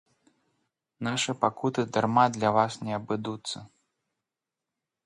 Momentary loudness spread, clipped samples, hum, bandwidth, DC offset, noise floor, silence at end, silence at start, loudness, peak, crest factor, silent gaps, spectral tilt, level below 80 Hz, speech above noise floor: 13 LU; under 0.1%; none; 11.5 kHz; under 0.1%; -88 dBFS; 1.4 s; 1 s; -27 LUFS; -6 dBFS; 24 dB; none; -5 dB/octave; -68 dBFS; 61 dB